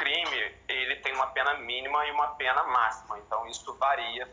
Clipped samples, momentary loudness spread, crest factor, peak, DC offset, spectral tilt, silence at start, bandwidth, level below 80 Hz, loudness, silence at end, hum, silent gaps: under 0.1%; 8 LU; 18 dB; -12 dBFS; under 0.1%; -1 dB/octave; 0 s; 7.8 kHz; -62 dBFS; -28 LUFS; 0 s; none; none